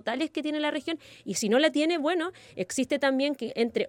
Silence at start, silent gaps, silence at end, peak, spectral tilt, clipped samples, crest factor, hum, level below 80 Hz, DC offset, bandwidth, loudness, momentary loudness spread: 0.05 s; none; 0 s; -12 dBFS; -3.5 dB/octave; under 0.1%; 16 dB; none; -72 dBFS; under 0.1%; 17 kHz; -28 LUFS; 11 LU